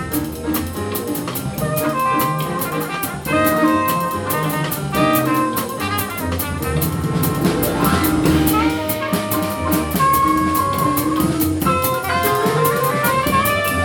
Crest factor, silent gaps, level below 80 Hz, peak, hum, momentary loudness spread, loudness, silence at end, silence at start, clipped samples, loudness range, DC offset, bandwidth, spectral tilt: 16 dB; none; -36 dBFS; -2 dBFS; none; 7 LU; -18 LUFS; 0 s; 0 s; under 0.1%; 2 LU; under 0.1%; 19.5 kHz; -5 dB/octave